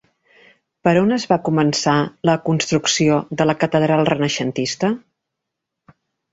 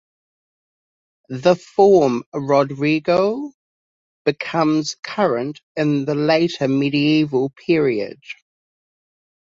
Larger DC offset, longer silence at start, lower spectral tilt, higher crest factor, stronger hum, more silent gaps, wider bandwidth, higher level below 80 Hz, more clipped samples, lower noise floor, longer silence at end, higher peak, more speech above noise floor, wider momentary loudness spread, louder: neither; second, 0.85 s vs 1.3 s; about the same, -5 dB/octave vs -6 dB/octave; about the same, 18 dB vs 18 dB; neither; second, none vs 2.26-2.32 s, 3.54-4.25 s, 4.99-5.03 s, 5.63-5.75 s; about the same, 8 kHz vs 7.6 kHz; first, -56 dBFS vs -62 dBFS; neither; second, -80 dBFS vs under -90 dBFS; first, 1.35 s vs 1.2 s; about the same, -2 dBFS vs -2 dBFS; second, 63 dB vs over 72 dB; second, 5 LU vs 12 LU; about the same, -18 LUFS vs -18 LUFS